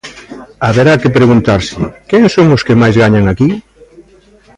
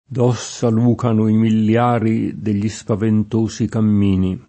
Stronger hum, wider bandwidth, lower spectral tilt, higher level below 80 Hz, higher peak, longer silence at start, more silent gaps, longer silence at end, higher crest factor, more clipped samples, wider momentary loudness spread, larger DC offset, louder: neither; first, 10.5 kHz vs 8.6 kHz; about the same, -7 dB/octave vs -7.5 dB/octave; first, -34 dBFS vs -50 dBFS; about the same, 0 dBFS vs -2 dBFS; about the same, 0.05 s vs 0.1 s; neither; first, 0.95 s vs 0.05 s; second, 10 dB vs 16 dB; neither; first, 12 LU vs 5 LU; neither; first, -9 LUFS vs -17 LUFS